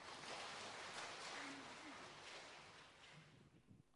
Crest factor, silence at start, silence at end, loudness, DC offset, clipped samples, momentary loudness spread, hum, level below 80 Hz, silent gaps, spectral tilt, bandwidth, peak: 16 dB; 0 s; 0 s; -53 LUFS; under 0.1%; under 0.1%; 13 LU; none; -84 dBFS; none; -2 dB/octave; 11.5 kHz; -40 dBFS